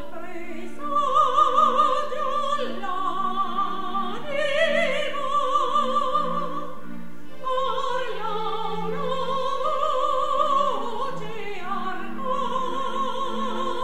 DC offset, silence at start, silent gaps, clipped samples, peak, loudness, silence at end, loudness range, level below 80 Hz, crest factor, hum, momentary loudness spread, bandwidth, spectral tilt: 4%; 0 s; none; under 0.1%; -8 dBFS; -25 LUFS; 0 s; 5 LU; -58 dBFS; 18 dB; none; 14 LU; 15.5 kHz; -4 dB/octave